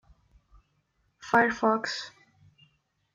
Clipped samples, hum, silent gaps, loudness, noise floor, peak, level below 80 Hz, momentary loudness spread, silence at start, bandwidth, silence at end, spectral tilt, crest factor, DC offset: under 0.1%; none; none; -26 LUFS; -73 dBFS; -8 dBFS; -66 dBFS; 20 LU; 1.25 s; 9.2 kHz; 1.05 s; -4 dB/octave; 22 dB; under 0.1%